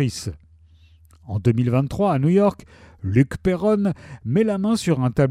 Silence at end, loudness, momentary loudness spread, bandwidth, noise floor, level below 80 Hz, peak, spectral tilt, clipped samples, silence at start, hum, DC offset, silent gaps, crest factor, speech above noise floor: 0 s; -21 LUFS; 13 LU; 14 kHz; -51 dBFS; -46 dBFS; -4 dBFS; -7.5 dB/octave; under 0.1%; 0 s; none; under 0.1%; none; 16 dB; 31 dB